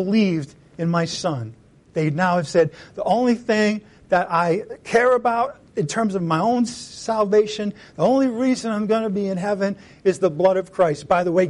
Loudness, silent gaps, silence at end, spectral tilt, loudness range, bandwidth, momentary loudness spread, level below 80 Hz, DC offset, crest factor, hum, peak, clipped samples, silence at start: -21 LUFS; none; 0 s; -6 dB/octave; 2 LU; 11.5 kHz; 9 LU; -58 dBFS; under 0.1%; 14 dB; none; -6 dBFS; under 0.1%; 0 s